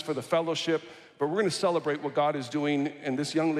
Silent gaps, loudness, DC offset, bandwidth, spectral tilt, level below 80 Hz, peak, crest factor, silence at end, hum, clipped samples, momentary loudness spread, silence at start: none; -29 LUFS; under 0.1%; 13.5 kHz; -5 dB/octave; -78 dBFS; -12 dBFS; 16 dB; 0 s; none; under 0.1%; 5 LU; 0 s